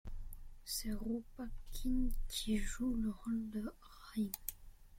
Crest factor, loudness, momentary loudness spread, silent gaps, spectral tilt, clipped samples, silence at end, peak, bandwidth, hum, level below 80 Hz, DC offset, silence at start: 18 dB; -41 LUFS; 14 LU; none; -4 dB/octave; under 0.1%; 0 s; -20 dBFS; 16.5 kHz; none; -44 dBFS; under 0.1%; 0.05 s